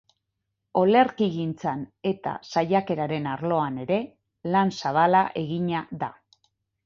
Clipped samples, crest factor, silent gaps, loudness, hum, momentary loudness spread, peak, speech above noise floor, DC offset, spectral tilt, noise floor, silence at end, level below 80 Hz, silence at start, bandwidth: under 0.1%; 18 dB; none; -25 LUFS; none; 11 LU; -6 dBFS; 56 dB; under 0.1%; -7 dB/octave; -80 dBFS; 0.75 s; -64 dBFS; 0.75 s; 7.4 kHz